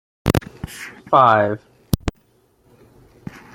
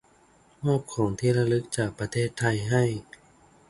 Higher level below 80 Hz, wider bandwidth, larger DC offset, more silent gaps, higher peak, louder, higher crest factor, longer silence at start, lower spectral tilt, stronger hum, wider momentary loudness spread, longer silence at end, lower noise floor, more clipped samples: first, -40 dBFS vs -54 dBFS; first, 16.5 kHz vs 11.5 kHz; neither; neither; first, 0 dBFS vs -10 dBFS; first, -18 LUFS vs -27 LUFS; about the same, 22 dB vs 18 dB; second, 0.25 s vs 0.6 s; about the same, -6 dB/octave vs -6 dB/octave; neither; first, 24 LU vs 5 LU; first, 1.45 s vs 0.7 s; about the same, -59 dBFS vs -59 dBFS; neither